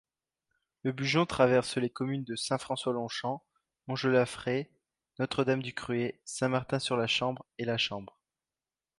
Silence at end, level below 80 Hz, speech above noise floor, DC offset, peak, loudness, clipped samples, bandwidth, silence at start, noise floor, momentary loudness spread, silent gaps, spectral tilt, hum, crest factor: 0.9 s; -66 dBFS; over 59 dB; under 0.1%; -10 dBFS; -31 LUFS; under 0.1%; 11.5 kHz; 0.85 s; under -90 dBFS; 11 LU; none; -5 dB/octave; none; 22 dB